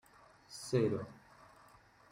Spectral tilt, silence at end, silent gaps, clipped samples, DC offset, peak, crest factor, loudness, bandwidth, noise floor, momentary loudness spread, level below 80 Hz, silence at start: -6.5 dB/octave; 1 s; none; under 0.1%; under 0.1%; -20 dBFS; 20 dB; -36 LUFS; 16 kHz; -63 dBFS; 26 LU; -72 dBFS; 0.5 s